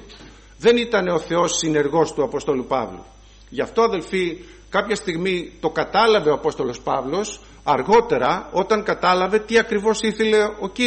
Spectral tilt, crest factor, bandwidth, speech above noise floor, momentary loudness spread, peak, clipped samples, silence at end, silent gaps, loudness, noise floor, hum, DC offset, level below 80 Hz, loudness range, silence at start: -4 dB/octave; 16 dB; 8.8 kHz; 24 dB; 9 LU; -6 dBFS; under 0.1%; 0 s; none; -20 LUFS; -43 dBFS; none; under 0.1%; -48 dBFS; 4 LU; 0 s